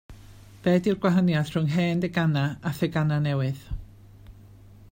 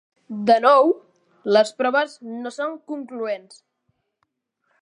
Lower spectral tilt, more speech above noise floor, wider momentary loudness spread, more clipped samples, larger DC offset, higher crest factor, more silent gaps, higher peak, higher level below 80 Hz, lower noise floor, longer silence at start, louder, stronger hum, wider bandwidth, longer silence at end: first, -7.5 dB/octave vs -4.5 dB/octave; second, 25 dB vs 54 dB; second, 8 LU vs 17 LU; neither; neither; about the same, 16 dB vs 20 dB; neither; second, -10 dBFS vs -2 dBFS; first, -48 dBFS vs -80 dBFS; second, -49 dBFS vs -74 dBFS; second, 0.1 s vs 0.3 s; second, -25 LUFS vs -20 LUFS; first, 50 Hz at -40 dBFS vs none; first, 16.5 kHz vs 11 kHz; second, 0.05 s vs 1.45 s